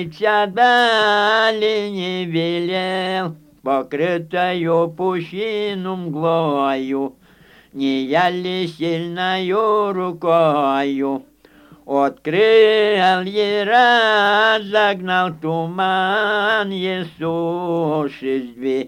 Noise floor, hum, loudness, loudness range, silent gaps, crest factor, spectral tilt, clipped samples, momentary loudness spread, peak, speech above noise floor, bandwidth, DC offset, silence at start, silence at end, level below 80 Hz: -49 dBFS; none; -18 LUFS; 6 LU; none; 16 dB; -5.5 dB/octave; under 0.1%; 10 LU; -2 dBFS; 31 dB; 16 kHz; under 0.1%; 0 s; 0 s; -62 dBFS